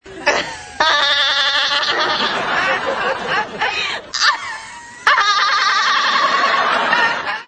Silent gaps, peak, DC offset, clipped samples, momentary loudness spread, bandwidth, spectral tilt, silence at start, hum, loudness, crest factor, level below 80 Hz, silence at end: none; 0 dBFS; under 0.1%; under 0.1%; 7 LU; 11 kHz; -0.5 dB/octave; 0.05 s; none; -15 LUFS; 18 dB; -54 dBFS; 0.05 s